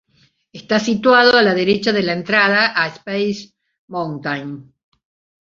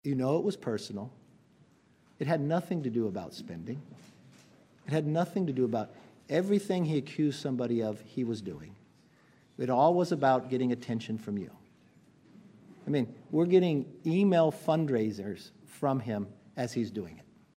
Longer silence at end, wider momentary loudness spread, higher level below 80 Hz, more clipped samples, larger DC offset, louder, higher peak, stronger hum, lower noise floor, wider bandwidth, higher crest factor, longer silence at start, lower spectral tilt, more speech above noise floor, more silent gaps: first, 0.8 s vs 0.35 s; about the same, 15 LU vs 16 LU; first, -58 dBFS vs -74 dBFS; neither; neither; first, -16 LUFS vs -31 LUFS; first, -2 dBFS vs -12 dBFS; neither; second, -59 dBFS vs -64 dBFS; second, 7.6 kHz vs 15.5 kHz; about the same, 16 dB vs 20 dB; first, 0.55 s vs 0.05 s; second, -5 dB/octave vs -7.5 dB/octave; first, 42 dB vs 34 dB; first, 3.78-3.88 s vs none